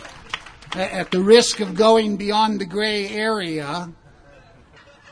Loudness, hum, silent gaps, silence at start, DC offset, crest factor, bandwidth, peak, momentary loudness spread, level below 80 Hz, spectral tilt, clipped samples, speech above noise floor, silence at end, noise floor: -19 LUFS; none; none; 0 s; under 0.1%; 20 dB; 10.5 kHz; 0 dBFS; 18 LU; -52 dBFS; -4 dB/octave; under 0.1%; 30 dB; 1.2 s; -49 dBFS